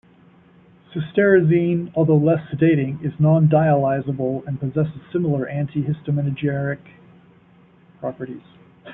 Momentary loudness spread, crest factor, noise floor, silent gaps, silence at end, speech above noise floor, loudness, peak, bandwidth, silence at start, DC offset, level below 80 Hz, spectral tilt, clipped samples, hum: 15 LU; 18 dB; -52 dBFS; none; 0 s; 33 dB; -20 LUFS; -4 dBFS; 3.8 kHz; 0.9 s; under 0.1%; -56 dBFS; -12.5 dB/octave; under 0.1%; none